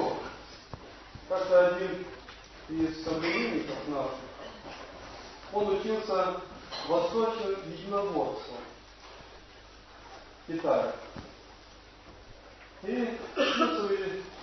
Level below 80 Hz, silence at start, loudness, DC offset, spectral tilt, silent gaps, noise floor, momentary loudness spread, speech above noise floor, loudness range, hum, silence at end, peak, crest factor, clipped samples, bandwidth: -58 dBFS; 0 s; -31 LUFS; under 0.1%; -5 dB/octave; none; -52 dBFS; 23 LU; 23 dB; 7 LU; none; 0 s; -12 dBFS; 22 dB; under 0.1%; 6.2 kHz